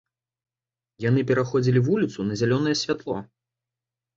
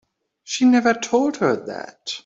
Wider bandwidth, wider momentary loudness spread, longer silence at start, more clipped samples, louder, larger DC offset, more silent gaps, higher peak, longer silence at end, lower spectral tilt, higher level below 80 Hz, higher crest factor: about the same, 7.8 kHz vs 7.8 kHz; second, 8 LU vs 15 LU; first, 1 s vs 0.5 s; neither; second, -24 LUFS vs -19 LUFS; neither; neither; second, -10 dBFS vs -4 dBFS; first, 0.9 s vs 0.05 s; first, -6.5 dB/octave vs -4 dB/octave; about the same, -60 dBFS vs -64 dBFS; about the same, 16 dB vs 16 dB